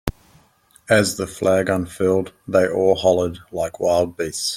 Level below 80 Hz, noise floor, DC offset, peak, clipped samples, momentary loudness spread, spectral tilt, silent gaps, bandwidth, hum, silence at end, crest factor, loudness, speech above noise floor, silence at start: -44 dBFS; -55 dBFS; under 0.1%; -2 dBFS; under 0.1%; 8 LU; -4.5 dB/octave; none; 16 kHz; none; 0 s; 18 dB; -20 LUFS; 36 dB; 0.05 s